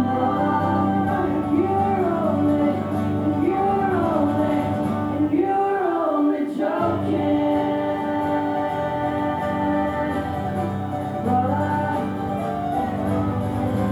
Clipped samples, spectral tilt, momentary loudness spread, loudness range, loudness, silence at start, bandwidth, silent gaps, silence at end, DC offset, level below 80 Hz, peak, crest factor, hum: under 0.1%; -8.5 dB/octave; 5 LU; 3 LU; -22 LUFS; 0 s; 12.5 kHz; none; 0 s; under 0.1%; -46 dBFS; -8 dBFS; 12 dB; none